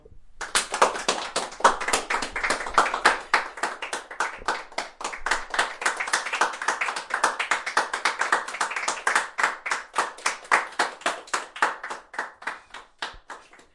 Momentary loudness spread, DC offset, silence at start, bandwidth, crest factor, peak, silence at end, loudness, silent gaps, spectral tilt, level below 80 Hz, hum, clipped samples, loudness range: 12 LU; under 0.1%; 0.1 s; 11.5 kHz; 24 dB; -2 dBFS; 0.2 s; -25 LUFS; none; 0 dB/octave; -52 dBFS; none; under 0.1%; 4 LU